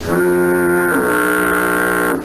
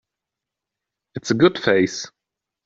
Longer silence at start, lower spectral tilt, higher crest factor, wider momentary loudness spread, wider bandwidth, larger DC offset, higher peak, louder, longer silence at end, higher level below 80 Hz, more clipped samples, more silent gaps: second, 0 s vs 1.15 s; about the same, -5 dB/octave vs -5 dB/octave; second, 10 dB vs 20 dB; second, 1 LU vs 19 LU; first, 15.5 kHz vs 7.8 kHz; neither; about the same, -4 dBFS vs -2 dBFS; first, -14 LUFS vs -19 LUFS; second, 0 s vs 0.6 s; first, -44 dBFS vs -62 dBFS; neither; neither